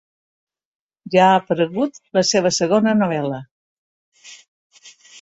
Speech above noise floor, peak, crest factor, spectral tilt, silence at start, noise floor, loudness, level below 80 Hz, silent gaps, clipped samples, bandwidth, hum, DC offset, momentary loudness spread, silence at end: 29 dB; -2 dBFS; 18 dB; -4.5 dB/octave; 1.05 s; -46 dBFS; -18 LUFS; -62 dBFS; 3.51-4.12 s, 4.48-4.70 s; under 0.1%; 8.2 kHz; none; under 0.1%; 10 LU; 0.3 s